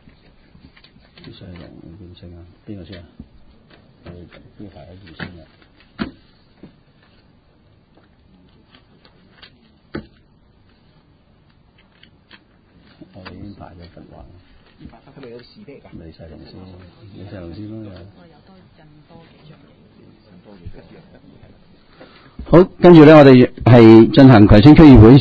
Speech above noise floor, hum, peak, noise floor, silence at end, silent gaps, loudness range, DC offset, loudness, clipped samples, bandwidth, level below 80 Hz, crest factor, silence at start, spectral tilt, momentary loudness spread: 41 dB; none; 0 dBFS; -53 dBFS; 0 s; none; 30 LU; under 0.1%; -7 LUFS; 0.6%; 6.6 kHz; -32 dBFS; 16 dB; 2.7 s; -9.5 dB/octave; 30 LU